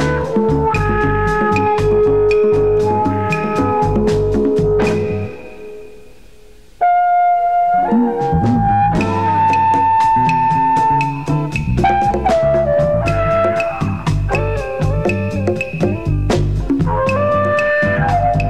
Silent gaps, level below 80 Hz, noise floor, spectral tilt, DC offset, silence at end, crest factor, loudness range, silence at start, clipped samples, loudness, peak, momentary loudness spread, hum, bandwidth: none; -28 dBFS; -44 dBFS; -7.5 dB/octave; 1%; 0 s; 12 dB; 4 LU; 0 s; under 0.1%; -15 LUFS; -2 dBFS; 6 LU; none; 12 kHz